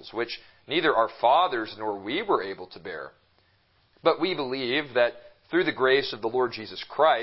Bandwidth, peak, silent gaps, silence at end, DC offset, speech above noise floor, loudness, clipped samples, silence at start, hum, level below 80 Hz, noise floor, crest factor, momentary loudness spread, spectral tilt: 5.8 kHz; -6 dBFS; none; 0 s; under 0.1%; 39 dB; -26 LUFS; under 0.1%; 0 s; none; -66 dBFS; -65 dBFS; 20 dB; 15 LU; -8.5 dB/octave